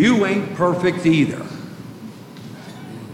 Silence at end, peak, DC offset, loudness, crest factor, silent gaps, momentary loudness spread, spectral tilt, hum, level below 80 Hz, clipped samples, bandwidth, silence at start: 0 s; -4 dBFS; under 0.1%; -18 LUFS; 16 dB; none; 20 LU; -6.5 dB/octave; none; -56 dBFS; under 0.1%; 15.5 kHz; 0 s